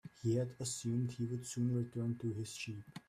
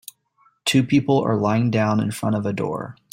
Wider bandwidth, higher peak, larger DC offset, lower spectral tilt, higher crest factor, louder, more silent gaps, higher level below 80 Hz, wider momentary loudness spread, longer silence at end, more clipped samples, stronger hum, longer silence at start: second, 14 kHz vs 16.5 kHz; second, -24 dBFS vs -6 dBFS; neither; about the same, -6 dB/octave vs -6 dB/octave; about the same, 14 dB vs 16 dB; second, -39 LUFS vs -21 LUFS; neither; second, -72 dBFS vs -58 dBFS; second, 6 LU vs 9 LU; about the same, 0.1 s vs 0.2 s; neither; neither; second, 0.05 s vs 0.65 s